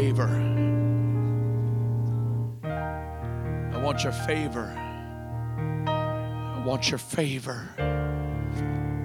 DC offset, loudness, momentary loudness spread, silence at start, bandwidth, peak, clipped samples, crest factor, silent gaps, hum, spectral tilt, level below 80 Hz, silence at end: under 0.1%; -28 LUFS; 9 LU; 0 s; 12.5 kHz; -12 dBFS; under 0.1%; 16 dB; none; none; -6 dB/octave; -42 dBFS; 0 s